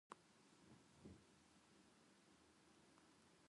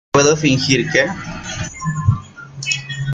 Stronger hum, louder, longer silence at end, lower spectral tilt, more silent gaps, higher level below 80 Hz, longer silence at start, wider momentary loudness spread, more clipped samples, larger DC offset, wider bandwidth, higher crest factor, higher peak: neither; second, -67 LUFS vs -18 LUFS; about the same, 0 s vs 0 s; about the same, -4 dB/octave vs -4 dB/octave; neither; second, -84 dBFS vs -42 dBFS; about the same, 0.1 s vs 0.15 s; second, 4 LU vs 13 LU; neither; neither; first, 11 kHz vs 9.4 kHz; first, 30 dB vs 18 dB; second, -38 dBFS vs 0 dBFS